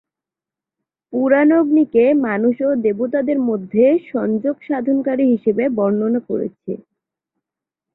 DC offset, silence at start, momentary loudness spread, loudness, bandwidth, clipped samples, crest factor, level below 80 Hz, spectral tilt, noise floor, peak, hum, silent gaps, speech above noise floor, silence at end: under 0.1%; 1.1 s; 10 LU; -17 LUFS; 4 kHz; under 0.1%; 16 dB; -62 dBFS; -12 dB/octave; -88 dBFS; -2 dBFS; none; none; 71 dB; 1.15 s